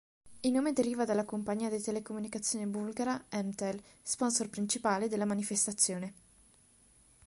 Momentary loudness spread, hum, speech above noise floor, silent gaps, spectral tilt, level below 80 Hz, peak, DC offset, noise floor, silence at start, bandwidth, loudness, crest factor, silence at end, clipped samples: 8 LU; none; 31 dB; none; -3.5 dB/octave; -70 dBFS; -12 dBFS; under 0.1%; -64 dBFS; 0.25 s; 11.5 kHz; -33 LUFS; 22 dB; 1.15 s; under 0.1%